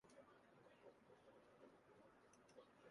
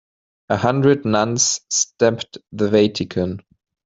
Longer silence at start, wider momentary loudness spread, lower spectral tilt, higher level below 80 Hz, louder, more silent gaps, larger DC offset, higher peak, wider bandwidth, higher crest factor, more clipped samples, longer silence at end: second, 0.05 s vs 0.5 s; second, 1 LU vs 10 LU; about the same, -4.5 dB/octave vs -4 dB/octave; second, under -90 dBFS vs -56 dBFS; second, -69 LUFS vs -18 LUFS; neither; neither; second, -52 dBFS vs -2 dBFS; first, 11 kHz vs 8 kHz; about the same, 18 dB vs 18 dB; neither; second, 0 s vs 0.45 s